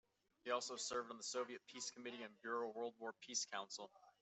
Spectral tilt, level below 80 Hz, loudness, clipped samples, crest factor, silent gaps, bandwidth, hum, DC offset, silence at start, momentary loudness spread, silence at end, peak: -0.5 dB/octave; under -90 dBFS; -47 LUFS; under 0.1%; 20 dB; none; 8.2 kHz; none; under 0.1%; 0.45 s; 9 LU; 0.1 s; -28 dBFS